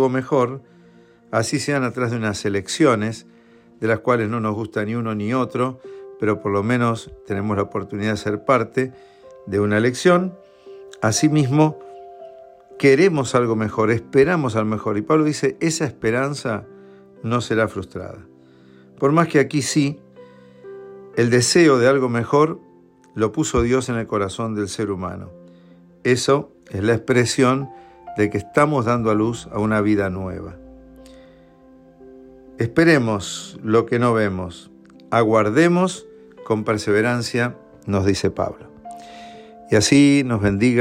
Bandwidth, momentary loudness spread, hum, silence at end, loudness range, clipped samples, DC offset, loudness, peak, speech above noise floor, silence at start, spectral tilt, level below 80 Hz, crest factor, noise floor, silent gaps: 15.5 kHz; 17 LU; none; 0 s; 5 LU; under 0.1%; under 0.1%; -20 LUFS; -4 dBFS; 31 dB; 0 s; -5.5 dB/octave; -48 dBFS; 16 dB; -50 dBFS; none